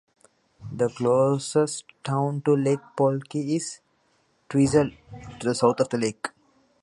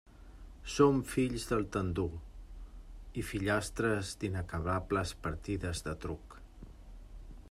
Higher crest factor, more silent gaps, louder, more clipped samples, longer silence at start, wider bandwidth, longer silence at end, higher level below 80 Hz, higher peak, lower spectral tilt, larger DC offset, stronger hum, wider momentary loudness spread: about the same, 20 dB vs 22 dB; neither; first, -25 LUFS vs -34 LUFS; neither; first, 0.6 s vs 0.05 s; second, 11.5 kHz vs 15 kHz; first, 0.55 s vs 0 s; second, -58 dBFS vs -48 dBFS; first, -6 dBFS vs -12 dBFS; about the same, -6 dB/octave vs -5.5 dB/octave; neither; neither; second, 14 LU vs 24 LU